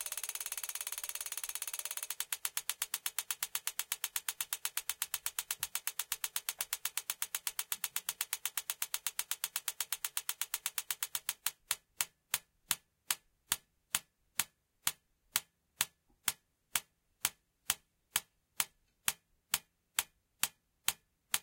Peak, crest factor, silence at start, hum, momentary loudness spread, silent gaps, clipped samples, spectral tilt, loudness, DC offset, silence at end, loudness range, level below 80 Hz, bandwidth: -6 dBFS; 34 dB; 0 s; none; 3 LU; none; under 0.1%; 2 dB/octave; -37 LUFS; under 0.1%; 0 s; 2 LU; -76 dBFS; 17.5 kHz